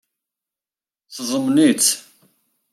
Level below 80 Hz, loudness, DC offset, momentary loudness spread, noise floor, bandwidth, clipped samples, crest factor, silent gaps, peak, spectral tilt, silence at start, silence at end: -74 dBFS; -17 LUFS; under 0.1%; 15 LU; under -90 dBFS; 15 kHz; under 0.1%; 18 dB; none; -4 dBFS; -2.5 dB/octave; 1.1 s; 0.75 s